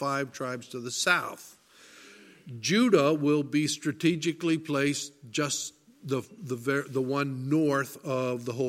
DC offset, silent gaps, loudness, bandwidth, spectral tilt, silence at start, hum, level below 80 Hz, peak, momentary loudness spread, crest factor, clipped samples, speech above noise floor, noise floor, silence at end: under 0.1%; none; -28 LUFS; 16.5 kHz; -4.5 dB/octave; 0 s; none; -74 dBFS; -8 dBFS; 11 LU; 20 dB; under 0.1%; 26 dB; -54 dBFS; 0 s